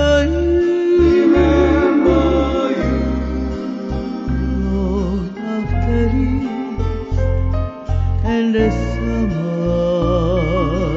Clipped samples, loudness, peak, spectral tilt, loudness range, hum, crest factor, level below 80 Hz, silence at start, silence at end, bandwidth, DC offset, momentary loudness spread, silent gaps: under 0.1%; -17 LUFS; -2 dBFS; -8 dB/octave; 5 LU; none; 14 dB; -22 dBFS; 0 s; 0 s; 7.6 kHz; under 0.1%; 10 LU; none